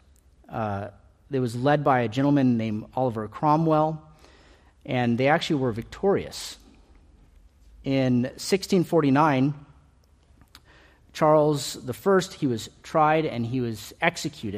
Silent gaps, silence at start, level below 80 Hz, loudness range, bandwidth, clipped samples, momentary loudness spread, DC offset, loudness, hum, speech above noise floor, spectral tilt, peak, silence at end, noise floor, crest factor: none; 0.5 s; -56 dBFS; 3 LU; 15 kHz; under 0.1%; 12 LU; under 0.1%; -24 LUFS; none; 35 dB; -6 dB/octave; -6 dBFS; 0 s; -58 dBFS; 20 dB